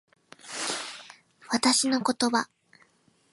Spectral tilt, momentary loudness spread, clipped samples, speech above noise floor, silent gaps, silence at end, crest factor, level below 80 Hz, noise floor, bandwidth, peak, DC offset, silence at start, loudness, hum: -1.5 dB/octave; 17 LU; under 0.1%; 39 dB; none; 0.9 s; 22 dB; -74 dBFS; -64 dBFS; 11.5 kHz; -8 dBFS; under 0.1%; 0.45 s; -26 LUFS; none